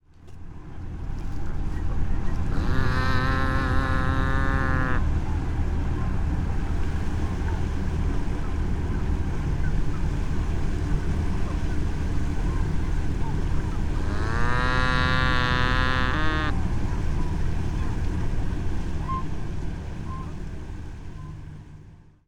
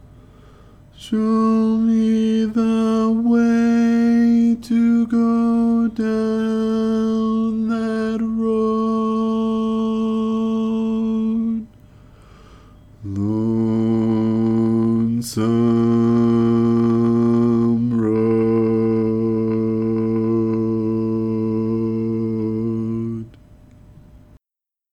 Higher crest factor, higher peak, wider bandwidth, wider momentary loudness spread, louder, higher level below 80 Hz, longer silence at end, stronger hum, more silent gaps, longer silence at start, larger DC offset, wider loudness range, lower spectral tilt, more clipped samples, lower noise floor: first, 16 dB vs 10 dB; about the same, -8 dBFS vs -8 dBFS; about the same, 9.8 kHz vs 10.5 kHz; first, 13 LU vs 6 LU; second, -27 LUFS vs -19 LUFS; first, -28 dBFS vs -50 dBFS; second, 0.3 s vs 0.75 s; second, none vs 50 Hz at -50 dBFS; neither; second, 0.2 s vs 0.95 s; neither; about the same, 6 LU vs 6 LU; second, -6.5 dB/octave vs -8 dB/octave; neither; second, -48 dBFS vs -87 dBFS